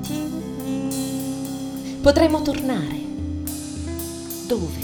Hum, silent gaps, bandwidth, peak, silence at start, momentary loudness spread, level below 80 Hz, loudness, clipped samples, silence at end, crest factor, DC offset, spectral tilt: none; none; over 20 kHz; 0 dBFS; 0 s; 12 LU; -40 dBFS; -24 LUFS; under 0.1%; 0 s; 24 dB; under 0.1%; -5.5 dB/octave